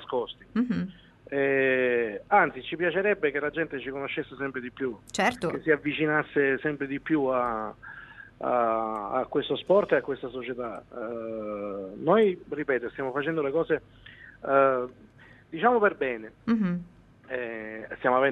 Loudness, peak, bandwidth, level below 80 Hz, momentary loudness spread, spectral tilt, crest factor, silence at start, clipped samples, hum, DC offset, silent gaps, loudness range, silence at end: -27 LUFS; -8 dBFS; 12 kHz; -62 dBFS; 13 LU; -6 dB/octave; 20 dB; 0 s; under 0.1%; none; under 0.1%; none; 3 LU; 0 s